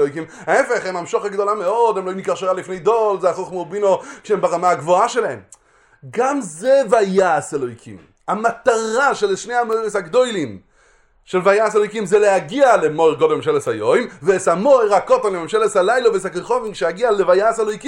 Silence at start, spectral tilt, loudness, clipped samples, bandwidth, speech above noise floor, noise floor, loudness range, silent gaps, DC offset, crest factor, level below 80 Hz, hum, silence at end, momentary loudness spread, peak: 0 s; -4.5 dB/octave; -17 LUFS; under 0.1%; 11.5 kHz; 37 dB; -54 dBFS; 4 LU; none; under 0.1%; 16 dB; -58 dBFS; none; 0 s; 8 LU; 0 dBFS